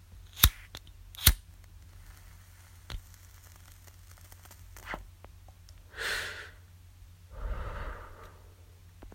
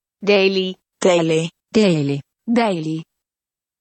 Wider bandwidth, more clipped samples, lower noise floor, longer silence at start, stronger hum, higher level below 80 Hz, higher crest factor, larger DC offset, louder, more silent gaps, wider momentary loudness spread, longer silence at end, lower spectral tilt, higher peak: first, 16.5 kHz vs 8.8 kHz; neither; second, -54 dBFS vs under -90 dBFS; about the same, 0.1 s vs 0.2 s; neither; first, -42 dBFS vs -62 dBFS; first, 36 dB vs 16 dB; neither; second, -30 LUFS vs -18 LUFS; neither; first, 29 LU vs 11 LU; second, 0 s vs 0.8 s; second, -2 dB/octave vs -5.5 dB/octave; about the same, 0 dBFS vs -2 dBFS